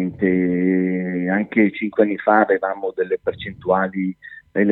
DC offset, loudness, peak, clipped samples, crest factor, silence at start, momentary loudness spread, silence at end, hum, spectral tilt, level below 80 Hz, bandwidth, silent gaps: under 0.1%; -20 LUFS; -2 dBFS; under 0.1%; 18 dB; 0 s; 10 LU; 0 s; none; -11 dB/octave; -56 dBFS; 4.1 kHz; none